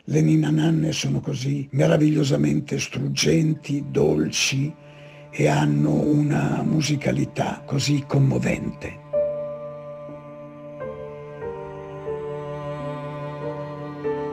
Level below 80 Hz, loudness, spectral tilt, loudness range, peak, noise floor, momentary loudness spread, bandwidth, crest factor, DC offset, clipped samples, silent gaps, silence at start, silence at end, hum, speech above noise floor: -52 dBFS; -23 LUFS; -6 dB/octave; 11 LU; -6 dBFS; -43 dBFS; 17 LU; 14.5 kHz; 16 dB; under 0.1%; under 0.1%; none; 0.05 s; 0 s; none; 22 dB